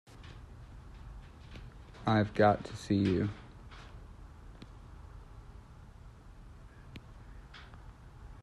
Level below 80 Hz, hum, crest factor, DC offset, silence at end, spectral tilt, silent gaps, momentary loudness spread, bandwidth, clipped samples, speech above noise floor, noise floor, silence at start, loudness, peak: -52 dBFS; none; 24 dB; under 0.1%; 0.1 s; -7.5 dB/octave; none; 25 LU; 11.5 kHz; under 0.1%; 23 dB; -52 dBFS; 0.2 s; -31 LUFS; -12 dBFS